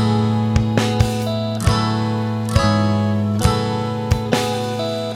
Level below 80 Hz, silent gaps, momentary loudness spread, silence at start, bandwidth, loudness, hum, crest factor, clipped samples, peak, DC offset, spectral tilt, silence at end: -32 dBFS; none; 5 LU; 0 s; 15 kHz; -19 LUFS; none; 16 dB; under 0.1%; -2 dBFS; under 0.1%; -6 dB/octave; 0 s